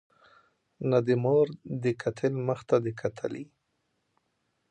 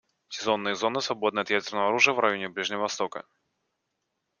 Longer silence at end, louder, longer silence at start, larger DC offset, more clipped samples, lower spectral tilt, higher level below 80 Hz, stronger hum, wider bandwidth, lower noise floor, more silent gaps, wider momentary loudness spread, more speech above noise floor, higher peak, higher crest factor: about the same, 1.25 s vs 1.2 s; about the same, -28 LUFS vs -26 LUFS; first, 0.8 s vs 0.3 s; neither; neither; first, -8 dB/octave vs -2.5 dB/octave; first, -68 dBFS vs -74 dBFS; neither; about the same, 9.2 kHz vs 10 kHz; about the same, -77 dBFS vs -80 dBFS; neither; about the same, 12 LU vs 11 LU; second, 49 dB vs 53 dB; second, -10 dBFS vs -4 dBFS; about the same, 20 dB vs 24 dB